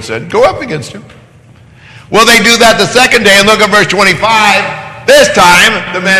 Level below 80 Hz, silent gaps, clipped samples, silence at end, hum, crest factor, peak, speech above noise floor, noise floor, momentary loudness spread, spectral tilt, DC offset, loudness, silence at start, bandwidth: -38 dBFS; none; 4%; 0 s; none; 8 dB; 0 dBFS; 31 dB; -38 dBFS; 13 LU; -2.5 dB/octave; under 0.1%; -5 LUFS; 0 s; 16 kHz